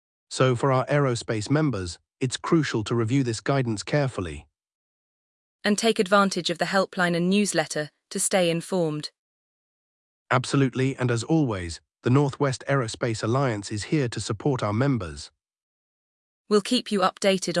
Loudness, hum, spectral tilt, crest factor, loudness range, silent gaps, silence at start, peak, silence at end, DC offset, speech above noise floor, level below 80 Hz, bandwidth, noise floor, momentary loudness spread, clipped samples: -24 LUFS; none; -5 dB/octave; 18 dB; 3 LU; 4.75-5.59 s, 9.19-10.26 s, 15.63-16.45 s; 0.3 s; -6 dBFS; 0 s; under 0.1%; over 66 dB; -58 dBFS; 12 kHz; under -90 dBFS; 9 LU; under 0.1%